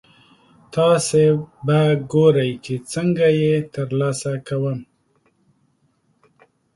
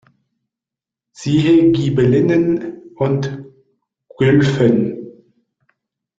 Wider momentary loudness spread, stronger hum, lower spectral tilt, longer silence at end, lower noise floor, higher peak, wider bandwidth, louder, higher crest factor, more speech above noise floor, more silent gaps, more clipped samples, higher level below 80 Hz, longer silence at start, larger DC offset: second, 10 LU vs 15 LU; neither; second, -6 dB/octave vs -7.5 dB/octave; first, 1.9 s vs 1.1 s; second, -64 dBFS vs -87 dBFS; about the same, -2 dBFS vs -2 dBFS; first, 11.5 kHz vs 7.8 kHz; second, -19 LUFS vs -15 LUFS; about the same, 18 dB vs 16 dB; second, 46 dB vs 73 dB; neither; neither; second, -58 dBFS vs -50 dBFS; second, 0.7 s vs 1.2 s; neither